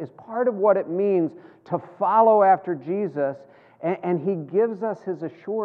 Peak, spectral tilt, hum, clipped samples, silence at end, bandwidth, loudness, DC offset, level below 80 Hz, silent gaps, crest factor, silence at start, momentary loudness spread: -6 dBFS; -10.5 dB/octave; none; under 0.1%; 0 s; 4.8 kHz; -23 LUFS; under 0.1%; -86 dBFS; none; 16 dB; 0 s; 14 LU